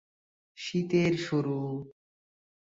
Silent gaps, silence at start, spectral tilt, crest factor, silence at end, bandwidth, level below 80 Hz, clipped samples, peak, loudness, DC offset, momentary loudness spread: none; 0.55 s; -6.5 dB/octave; 18 dB; 0.8 s; 7.8 kHz; -68 dBFS; under 0.1%; -14 dBFS; -30 LUFS; under 0.1%; 14 LU